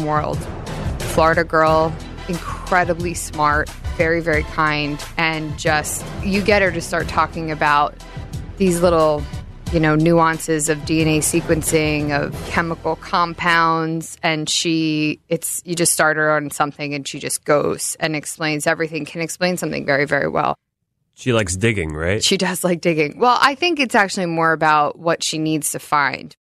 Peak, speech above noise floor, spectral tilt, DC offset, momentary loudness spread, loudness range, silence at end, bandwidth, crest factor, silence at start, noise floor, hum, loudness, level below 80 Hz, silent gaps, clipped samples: 0 dBFS; 54 dB; -4 dB/octave; under 0.1%; 10 LU; 3 LU; 0.15 s; 14.5 kHz; 18 dB; 0 s; -72 dBFS; none; -18 LUFS; -36 dBFS; none; under 0.1%